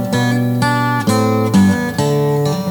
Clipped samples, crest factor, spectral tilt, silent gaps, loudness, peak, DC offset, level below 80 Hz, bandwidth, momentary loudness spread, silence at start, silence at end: under 0.1%; 12 dB; -6 dB/octave; none; -15 LUFS; -2 dBFS; under 0.1%; -46 dBFS; over 20 kHz; 4 LU; 0 s; 0 s